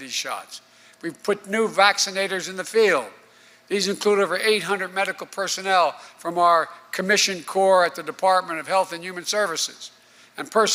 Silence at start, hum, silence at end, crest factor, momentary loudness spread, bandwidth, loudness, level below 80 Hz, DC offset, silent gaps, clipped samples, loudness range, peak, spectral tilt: 0 s; none; 0 s; 20 dB; 15 LU; 16 kHz; -22 LUFS; -74 dBFS; under 0.1%; none; under 0.1%; 2 LU; -2 dBFS; -2 dB/octave